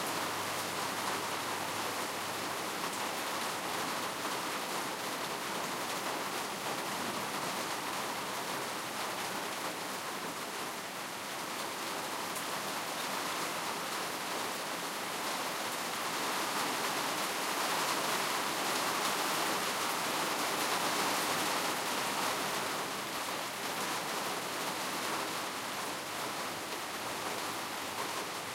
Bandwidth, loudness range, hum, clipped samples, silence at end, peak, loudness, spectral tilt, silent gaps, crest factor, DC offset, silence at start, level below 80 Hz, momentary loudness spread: 16 kHz; 5 LU; none; under 0.1%; 0 s; -18 dBFS; -35 LUFS; -1.5 dB/octave; none; 18 dB; under 0.1%; 0 s; -76 dBFS; 6 LU